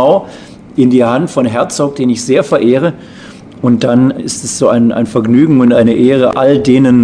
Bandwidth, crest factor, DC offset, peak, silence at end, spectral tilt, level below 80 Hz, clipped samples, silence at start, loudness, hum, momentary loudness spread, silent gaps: 10 kHz; 10 dB; under 0.1%; 0 dBFS; 0 s; -6 dB/octave; -46 dBFS; 1%; 0 s; -10 LUFS; none; 9 LU; none